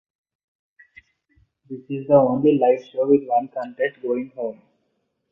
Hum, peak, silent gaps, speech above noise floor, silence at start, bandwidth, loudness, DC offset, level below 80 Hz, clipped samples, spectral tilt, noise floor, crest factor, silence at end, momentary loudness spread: none; -4 dBFS; none; 52 dB; 1.7 s; 6.4 kHz; -21 LUFS; under 0.1%; -66 dBFS; under 0.1%; -9.5 dB/octave; -72 dBFS; 20 dB; 0.8 s; 14 LU